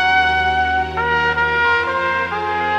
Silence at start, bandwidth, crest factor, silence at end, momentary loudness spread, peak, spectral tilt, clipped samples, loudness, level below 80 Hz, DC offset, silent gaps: 0 s; 9.6 kHz; 12 dB; 0 s; 5 LU; -4 dBFS; -4.5 dB/octave; under 0.1%; -17 LUFS; -38 dBFS; under 0.1%; none